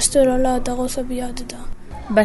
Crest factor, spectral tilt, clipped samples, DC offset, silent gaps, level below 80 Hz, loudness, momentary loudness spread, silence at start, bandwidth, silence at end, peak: 16 dB; -3.5 dB/octave; under 0.1%; under 0.1%; none; -30 dBFS; -20 LUFS; 21 LU; 0 s; 12 kHz; 0 s; -2 dBFS